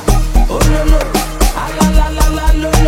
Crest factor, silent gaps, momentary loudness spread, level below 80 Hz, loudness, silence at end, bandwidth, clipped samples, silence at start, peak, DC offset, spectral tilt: 10 dB; none; 3 LU; -12 dBFS; -14 LUFS; 0 s; 16.5 kHz; under 0.1%; 0 s; 0 dBFS; under 0.1%; -5 dB/octave